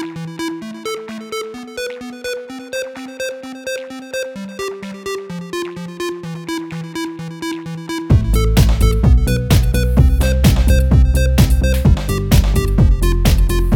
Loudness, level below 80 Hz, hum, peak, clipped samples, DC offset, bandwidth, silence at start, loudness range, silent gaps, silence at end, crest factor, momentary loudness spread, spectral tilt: -17 LUFS; -18 dBFS; none; 0 dBFS; under 0.1%; under 0.1%; 17.5 kHz; 0 s; 12 LU; none; 0 s; 16 dB; 13 LU; -6 dB/octave